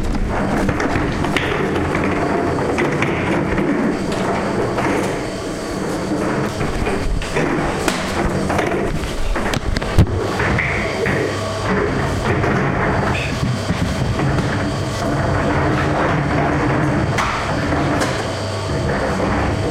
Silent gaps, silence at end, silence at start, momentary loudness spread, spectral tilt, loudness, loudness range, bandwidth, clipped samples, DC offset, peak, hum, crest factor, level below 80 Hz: none; 0 s; 0 s; 4 LU; -6 dB/octave; -19 LUFS; 2 LU; 16 kHz; under 0.1%; under 0.1%; -2 dBFS; none; 16 dB; -30 dBFS